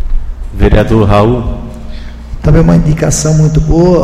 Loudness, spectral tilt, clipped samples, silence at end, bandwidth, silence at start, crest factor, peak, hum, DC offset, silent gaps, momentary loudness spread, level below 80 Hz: -9 LUFS; -6.5 dB/octave; 0.6%; 0 s; 13 kHz; 0 s; 8 dB; 0 dBFS; none; under 0.1%; none; 19 LU; -14 dBFS